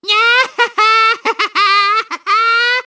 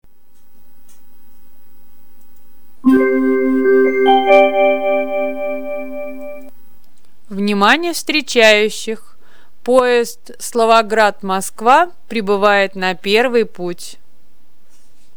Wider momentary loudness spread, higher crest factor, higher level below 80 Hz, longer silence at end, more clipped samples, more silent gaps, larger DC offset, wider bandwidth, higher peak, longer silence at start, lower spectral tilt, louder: second, 5 LU vs 17 LU; about the same, 12 dB vs 16 dB; about the same, -62 dBFS vs -58 dBFS; second, 0.1 s vs 1.25 s; neither; neither; second, under 0.1% vs 4%; second, 8 kHz vs over 20 kHz; about the same, 0 dBFS vs 0 dBFS; about the same, 0.05 s vs 0 s; second, 0.5 dB/octave vs -3.5 dB/octave; first, -11 LUFS vs -14 LUFS